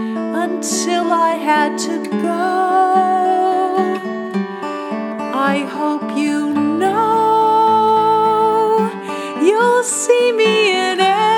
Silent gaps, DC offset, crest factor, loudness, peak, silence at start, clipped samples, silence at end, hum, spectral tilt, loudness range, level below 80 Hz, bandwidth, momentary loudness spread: none; under 0.1%; 14 dB; -16 LUFS; 0 dBFS; 0 s; under 0.1%; 0 s; none; -3.5 dB/octave; 5 LU; -74 dBFS; 17.5 kHz; 10 LU